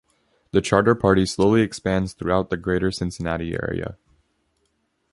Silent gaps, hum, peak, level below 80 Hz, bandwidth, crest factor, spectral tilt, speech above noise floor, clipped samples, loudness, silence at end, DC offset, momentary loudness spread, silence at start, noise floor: none; none; -2 dBFS; -42 dBFS; 11.5 kHz; 20 dB; -6 dB/octave; 49 dB; under 0.1%; -22 LUFS; 1.2 s; under 0.1%; 9 LU; 0.55 s; -70 dBFS